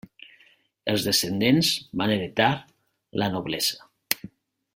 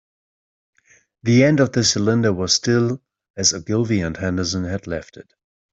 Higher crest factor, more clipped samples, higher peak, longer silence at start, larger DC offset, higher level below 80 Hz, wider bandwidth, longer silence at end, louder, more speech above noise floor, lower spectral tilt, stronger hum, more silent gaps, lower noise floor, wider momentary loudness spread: first, 26 dB vs 18 dB; neither; about the same, 0 dBFS vs -2 dBFS; second, 0.85 s vs 1.25 s; neither; second, -60 dBFS vs -52 dBFS; first, 16.5 kHz vs 8.2 kHz; about the same, 0.5 s vs 0.5 s; second, -24 LUFS vs -19 LUFS; about the same, 36 dB vs 37 dB; about the same, -4 dB/octave vs -4.5 dB/octave; neither; second, none vs 3.30-3.34 s; first, -60 dBFS vs -56 dBFS; about the same, 10 LU vs 12 LU